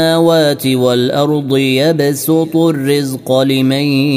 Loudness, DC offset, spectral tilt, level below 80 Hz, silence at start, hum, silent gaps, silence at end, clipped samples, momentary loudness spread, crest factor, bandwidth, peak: -12 LUFS; under 0.1%; -5.5 dB/octave; -56 dBFS; 0 s; none; none; 0 s; under 0.1%; 4 LU; 12 dB; 16 kHz; 0 dBFS